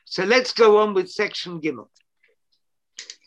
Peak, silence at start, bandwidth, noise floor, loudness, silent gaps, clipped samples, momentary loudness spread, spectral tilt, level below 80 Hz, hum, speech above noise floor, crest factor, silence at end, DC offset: -4 dBFS; 0.1 s; 8.8 kHz; -74 dBFS; -20 LUFS; none; under 0.1%; 23 LU; -4 dB/octave; -74 dBFS; none; 54 dB; 20 dB; 0.15 s; under 0.1%